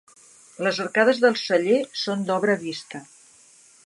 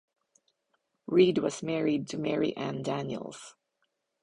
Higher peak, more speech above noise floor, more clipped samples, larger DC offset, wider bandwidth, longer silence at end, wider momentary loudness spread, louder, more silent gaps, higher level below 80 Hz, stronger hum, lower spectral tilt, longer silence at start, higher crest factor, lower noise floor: first, -6 dBFS vs -12 dBFS; second, 31 dB vs 50 dB; neither; neither; about the same, 11.5 kHz vs 10.5 kHz; first, 0.85 s vs 0.7 s; second, 15 LU vs 20 LU; first, -22 LUFS vs -29 LUFS; neither; second, -78 dBFS vs -70 dBFS; neither; second, -4.5 dB/octave vs -6 dB/octave; second, 0.6 s vs 1.1 s; about the same, 18 dB vs 20 dB; second, -53 dBFS vs -79 dBFS